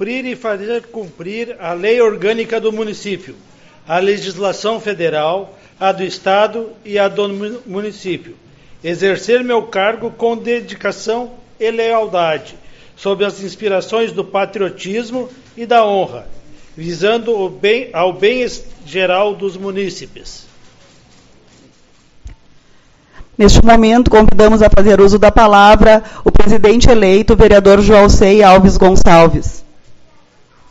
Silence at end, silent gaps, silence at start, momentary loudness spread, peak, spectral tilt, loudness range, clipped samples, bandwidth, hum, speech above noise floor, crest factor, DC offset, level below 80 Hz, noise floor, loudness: 0.75 s; none; 0 s; 17 LU; 0 dBFS; -5.5 dB/octave; 11 LU; 0.6%; 8 kHz; none; 37 dB; 12 dB; under 0.1%; -22 dBFS; -48 dBFS; -12 LUFS